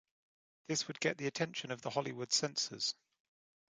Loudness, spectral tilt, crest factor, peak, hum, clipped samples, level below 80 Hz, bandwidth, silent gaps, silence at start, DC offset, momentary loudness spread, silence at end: -37 LUFS; -2.5 dB/octave; 24 dB; -16 dBFS; none; under 0.1%; -82 dBFS; 10 kHz; none; 0.7 s; under 0.1%; 6 LU; 0.75 s